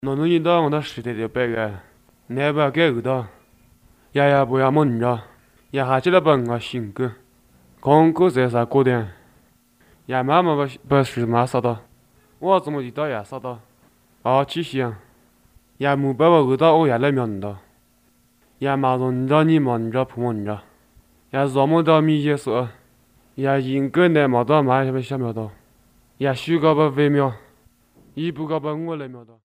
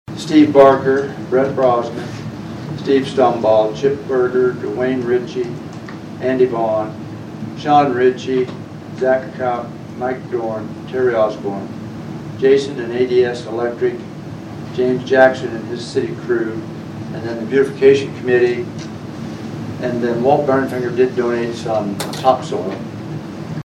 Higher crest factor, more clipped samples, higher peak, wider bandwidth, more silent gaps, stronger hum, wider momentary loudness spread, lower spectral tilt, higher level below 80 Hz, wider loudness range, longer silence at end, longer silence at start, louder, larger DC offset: about the same, 20 dB vs 18 dB; neither; about the same, 0 dBFS vs 0 dBFS; first, 15.5 kHz vs 12.5 kHz; neither; neither; second, 13 LU vs 16 LU; about the same, -7.5 dB/octave vs -6.5 dB/octave; second, -58 dBFS vs -52 dBFS; about the same, 4 LU vs 3 LU; about the same, 0.2 s vs 0.15 s; about the same, 0.05 s vs 0.1 s; second, -20 LUFS vs -17 LUFS; neither